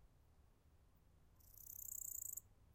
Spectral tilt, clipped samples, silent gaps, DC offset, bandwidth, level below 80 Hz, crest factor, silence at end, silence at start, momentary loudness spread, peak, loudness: -2 dB/octave; under 0.1%; none; under 0.1%; 17 kHz; -72 dBFS; 20 dB; 0 s; 0 s; 13 LU; -36 dBFS; -49 LUFS